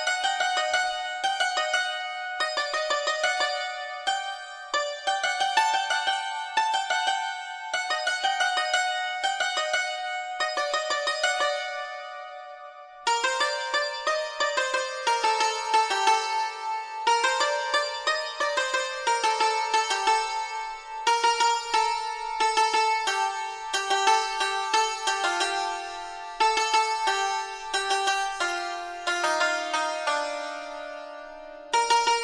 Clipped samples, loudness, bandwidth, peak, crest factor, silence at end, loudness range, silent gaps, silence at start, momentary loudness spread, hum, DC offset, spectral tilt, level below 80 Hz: under 0.1%; -26 LUFS; 11 kHz; -8 dBFS; 20 dB; 0 s; 3 LU; none; 0 s; 10 LU; none; under 0.1%; 1.5 dB/octave; -64 dBFS